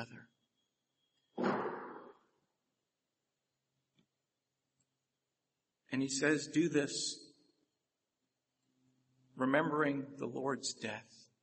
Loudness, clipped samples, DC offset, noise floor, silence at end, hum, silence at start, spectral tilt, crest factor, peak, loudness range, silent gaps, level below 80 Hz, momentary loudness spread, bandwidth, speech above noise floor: -36 LUFS; under 0.1%; under 0.1%; -89 dBFS; 0.2 s; none; 0 s; -4 dB/octave; 24 dB; -16 dBFS; 7 LU; none; -86 dBFS; 16 LU; 8.4 kHz; 53 dB